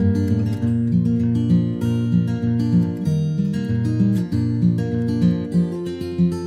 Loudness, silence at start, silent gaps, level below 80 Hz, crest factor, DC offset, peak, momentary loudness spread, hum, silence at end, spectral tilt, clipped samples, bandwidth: -20 LUFS; 0 s; none; -46 dBFS; 12 dB; under 0.1%; -6 dBFS; 3 LU; none; 0 s; -9 dB/octave; under 0.1%; 10 kHz